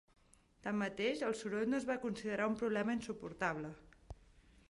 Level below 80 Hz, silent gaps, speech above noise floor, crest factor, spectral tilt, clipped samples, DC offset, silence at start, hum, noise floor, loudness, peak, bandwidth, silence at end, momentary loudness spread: -66 dBFS; none; 27 dB; 18 dB; -5.5 dB/octave; under 0.1%; under 0.1%; 0.65 s; none; -65 dBFS; -39 LUFS; -22 dBFS; 11.5 kHz; 0.3 s; 21 LU